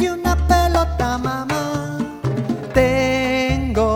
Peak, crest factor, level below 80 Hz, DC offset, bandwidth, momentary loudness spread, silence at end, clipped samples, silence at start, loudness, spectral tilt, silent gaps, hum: 0 dBFS; 18 dB; -26 dBFS; under 0.1%; 17.5 kHz; 8 LU; 0 s; under 0.1%; 0 s; -19 LUFS; -6 dB/octave; none; none